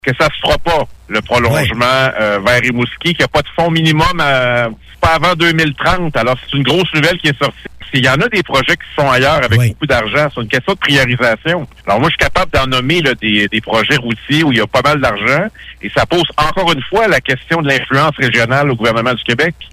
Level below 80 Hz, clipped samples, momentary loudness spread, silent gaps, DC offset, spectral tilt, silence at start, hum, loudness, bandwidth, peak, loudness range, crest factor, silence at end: -34 dBFS; under 0.1%; 5 LU; none; under 0.1%; -5 dB/octave; 0.05 s; none; -12 LUFS; 15.5 kHz; 0 dBFS; 1 LU; 12 dB; 0.05 s